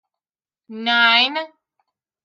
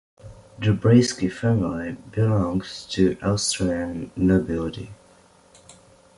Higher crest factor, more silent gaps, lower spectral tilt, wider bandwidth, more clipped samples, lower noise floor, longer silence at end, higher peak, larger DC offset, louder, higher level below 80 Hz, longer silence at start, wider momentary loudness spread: about the same, 20 dB vs 18 dB; neither; second, -2.5 dB/octave vs -6 dB/octave; first, 13 kHz vs 11.5 kHz; neither; first, under -90 dBFS vs -54 dBFS; second, 0.75 s vs 1.25 s; about the same, -2 dBFS vs -4 dBFS; neither; first, -16 LUFS vs -23 LUFS; second, -80 dBFS vs -44 dBFS; first, 0.7 s vs 0.25 s; first, 16 LU vs 13 LU